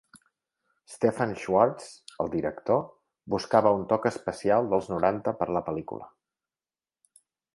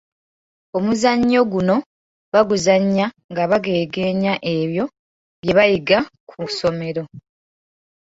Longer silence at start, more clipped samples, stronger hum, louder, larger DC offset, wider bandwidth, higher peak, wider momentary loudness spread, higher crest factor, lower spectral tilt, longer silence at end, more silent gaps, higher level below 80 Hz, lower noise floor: second, 0.15 s vs 0.75 s; neither; neither; second, -27 LUFS vs -19 LUFS; neither; first, 11.5 kHz vs 8 kHz; second, -6 dBFS vs -2 dBFS; about the same, 12 LU vs 12 LU; about the same, 22 dB vs 18 dB; about the same, -6.5 dB/octave vs -5.5 dB/octave; first, 1.45 s vs 0.9 s; second, none vs 1.86-2.32 s, 3.24-3.29 s, 4.99-5.43 s, 6.20-6.27 s; second, -60 dBFS vs -54 dBFS; about the same, under -90 dBFS vs under -90 dBFS